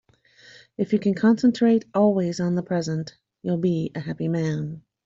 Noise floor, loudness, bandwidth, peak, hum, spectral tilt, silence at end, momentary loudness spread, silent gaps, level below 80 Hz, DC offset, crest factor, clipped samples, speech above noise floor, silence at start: -53 dBFS; -23 LUFS; 7.6 kHz; -8 dBFS; none; -7.5 dB/octave; 0.25 s; 12 LU; none; -62 dBFS; under 0.1%; 16 dB; under 0.1%; 31 dB; 0.8 s